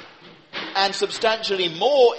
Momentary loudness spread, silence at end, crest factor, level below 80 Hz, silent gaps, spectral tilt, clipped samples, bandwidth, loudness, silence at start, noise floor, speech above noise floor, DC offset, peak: 11 LU; 0 s; 18 dB; -68 dBFS; none; -2.5 dB/octave; under 0.1%; 8.8 kHz; -21 LUFS; 0 s; -47 dBFS; 27 dB; under 0.1%; -4 dBFS